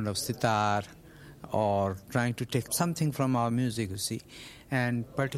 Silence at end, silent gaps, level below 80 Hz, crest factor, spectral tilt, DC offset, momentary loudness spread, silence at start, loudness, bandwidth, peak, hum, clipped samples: 0 s; none; -60 dBFS; 18 dB; -5 dB/octave; under 0.1%; 9 LU; 0 s; -30 LUFS; 16 kHz; -12 dBFS; none; under 0.1%